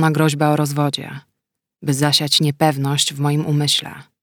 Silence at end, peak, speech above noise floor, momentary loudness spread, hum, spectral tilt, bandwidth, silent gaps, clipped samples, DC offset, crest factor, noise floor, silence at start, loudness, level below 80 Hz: 0.2 s; -2 dBFS; 62 dB; 13 LU; none; -4.5 dB/octave; 19.5 kHz; none; under 0.1%; under 0.1%; 16 dB; -80 dBFS; 0 s; -17 LUFS; -64 dBFS